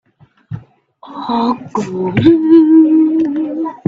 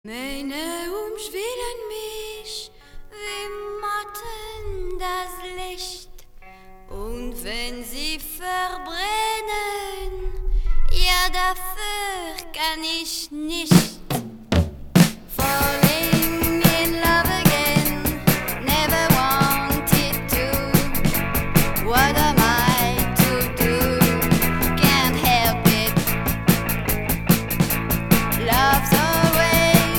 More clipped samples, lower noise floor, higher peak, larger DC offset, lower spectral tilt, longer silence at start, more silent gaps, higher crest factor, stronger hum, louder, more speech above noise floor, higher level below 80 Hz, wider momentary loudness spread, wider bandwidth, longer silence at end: neither; about the same, -42 dBFS vs -43 dBFS; about the same, 0 dBFS vs 0 dBFS; neither; first, -8 dB/octave vs -4.5 dB/octave; first, 0.5 s vs 0.05 s; neither; second, 12 dB vs 20 dB; neither; first, -12 LUFS vs -20 LUFS; first, 31 dB vs 20 dB; second, -52 dBFS vs -30 dBFS; first, 23 LU vs 15 LU; second, 7.2 kHz vs over 20 kHz; about the same, 0.1 s vs 0 s